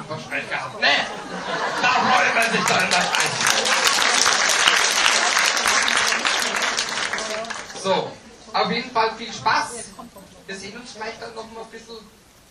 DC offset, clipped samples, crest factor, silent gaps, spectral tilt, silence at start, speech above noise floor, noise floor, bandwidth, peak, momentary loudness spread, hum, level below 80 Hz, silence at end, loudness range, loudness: under 0.1%; under 0.1%; 22 dB; none; -0.5 dB/octave; 0 s; 18 dB; -42 dBFS; 15.5 kHz; 0 dBFS; 18 LU; none; -58 dBFS; 0.5 s; 9 LU; -19 LUFS